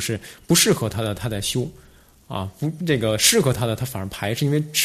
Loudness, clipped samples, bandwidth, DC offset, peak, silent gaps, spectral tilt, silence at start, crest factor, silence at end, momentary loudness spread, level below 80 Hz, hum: -21 LUFS; under 0.1%; 14 kHz; under 0.1%; -2 dBFS; none; -3.5 dB/octave; 0 s; 20 dB; 0 s; 15 LU; -48 dBFS; none